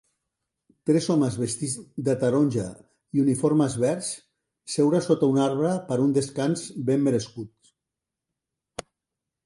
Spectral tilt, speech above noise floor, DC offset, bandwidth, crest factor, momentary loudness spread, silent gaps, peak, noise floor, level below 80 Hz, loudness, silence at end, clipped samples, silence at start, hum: -6 dB/octave; 63 dB; under 0.1%; 11.5 kHz; 18 dB; 16 LU; none; -8 dBFS; -86 dBFS; -62 dBFS; -24 LUFS; 0.65 s; under 0.1%; 0.85 s; none